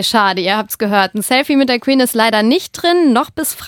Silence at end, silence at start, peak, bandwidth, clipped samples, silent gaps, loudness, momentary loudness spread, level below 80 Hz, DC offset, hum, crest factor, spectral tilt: 0 s; 0 s; 0 dBFS; 18 kHz; under 0.1%; none; -13 LUFS; 4 LU; -54 dBFS; under 0.1%; none; 14 dB; -3.5 dB/octave